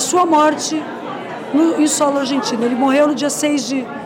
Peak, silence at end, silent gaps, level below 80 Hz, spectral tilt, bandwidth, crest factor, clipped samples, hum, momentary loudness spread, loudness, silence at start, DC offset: -4 dBFS; 0 s; none; -64 dBFS; -3 dB/octave; 16.5 kHz; 12 dB; under 0.1%; none; 11 LU; -16 LUFS; 0 s; under 0.1%